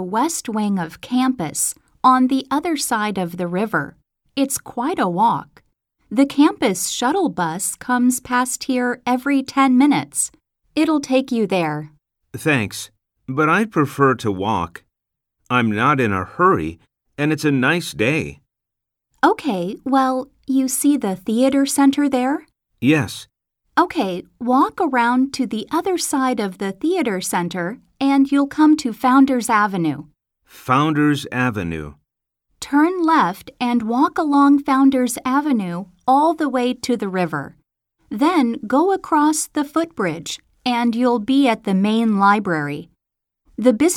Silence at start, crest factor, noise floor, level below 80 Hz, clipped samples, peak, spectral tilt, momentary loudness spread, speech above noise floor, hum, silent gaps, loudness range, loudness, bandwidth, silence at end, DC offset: 0 s; 18 dB; -82 dBFS; -56 dBFS; under 0.1%; -2 dBFS; -4.5 dB/octave; 9 LU; 64 dB; none; none; 3 LU; -19 LUFS; 16.5 kHz; 0 s; under 0.1%